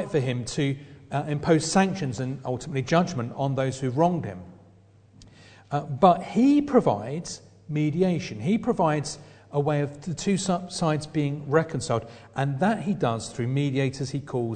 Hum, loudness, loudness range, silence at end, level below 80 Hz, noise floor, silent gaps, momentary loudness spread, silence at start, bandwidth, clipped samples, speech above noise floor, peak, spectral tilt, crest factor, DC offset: none; -26 LUFS; 3 LU; 0 s; -56 dBFS; -55 dBFS; none; 11 LU; 0 s; 9.4 kHz; under 0.1%; 30 dB; -4 dBFS; -6 dB/octave; 22 dB; under 0.1%